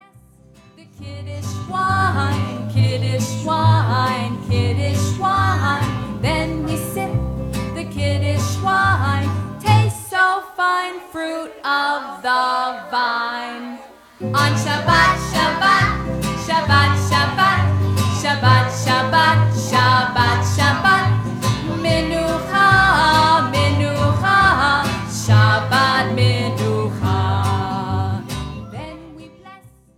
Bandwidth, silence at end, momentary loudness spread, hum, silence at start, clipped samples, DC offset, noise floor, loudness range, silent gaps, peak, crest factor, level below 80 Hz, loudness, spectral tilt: 15.5 kHz; 0.4 s; 12 LU; none; 0.8 s; under 0.1%; under 0.1%; -48 dBFS; 6 LU; none; -2 dBFS; 16 dB; -38 dBFS; -17 LUFS; -5 dB/octave